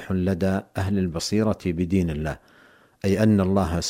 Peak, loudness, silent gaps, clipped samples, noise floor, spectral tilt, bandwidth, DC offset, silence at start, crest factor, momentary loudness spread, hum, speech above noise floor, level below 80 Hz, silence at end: -8 dBFS; -24 LUFS; none; under 0.1%; -55 dBFS; -6.5 dB/octave; 15.5 kHz; under 0.1%; 0 s; 16 dB; 10 LU; none; 32 dB; -42 dBFS; 0 s